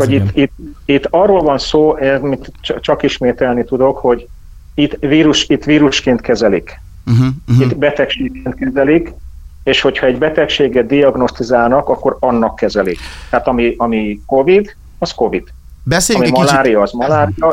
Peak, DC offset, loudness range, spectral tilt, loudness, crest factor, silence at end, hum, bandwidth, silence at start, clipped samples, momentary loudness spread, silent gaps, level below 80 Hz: 0 dBFS; under 0.1%; 2 LU; -5.5 dB/octave; -13 LUFS; 12 dB; 0 s; none; 16 kHz; 0 s; under 0.1%; 9 LU; none; -34 dBFS